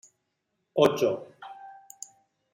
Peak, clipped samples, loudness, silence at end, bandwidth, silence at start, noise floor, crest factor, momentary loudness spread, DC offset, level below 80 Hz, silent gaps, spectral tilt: -6 dBFS; under 0.1%; -26 LUFS; 0.8 s; 16 kHz; 0.75 s; -79 dBFS; 24 dB; 23 LU; under 0.1%; -74 dBFS; none; -5 dB/octave